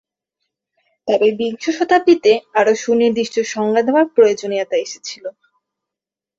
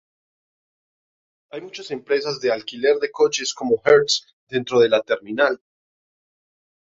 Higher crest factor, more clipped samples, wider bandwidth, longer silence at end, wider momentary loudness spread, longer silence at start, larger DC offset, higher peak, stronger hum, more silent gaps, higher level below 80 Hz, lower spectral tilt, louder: about the same, 16 dB vs 20 dB; neither; about the same, 7.6 kHz vs 7.8 kHz; second, 1.1 s vs 1.3 s; about the same, 15 LU vs 16 LU; second, 1.05 s vs 1.55 s; neither; about the same, -2 dBFS vs -2 dBFS; neither; second, none vs 4.33-4.47 s; about the same, -62 dBFS vs -66 dBFS; about the same, -4 dB/octave vs -3 dB/octave; first, -16 LUFS vs -20 LUFS